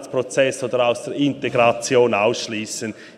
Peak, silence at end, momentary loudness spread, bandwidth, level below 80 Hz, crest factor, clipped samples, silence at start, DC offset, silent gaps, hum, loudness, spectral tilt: -2 dBFS; 0.05 s; 9 LU; 14 kHz; -62 dBFS; 16 dB; under 0.1%; 0 s; under 0.1%; none; none; -20 LUFS; -4 dB/octave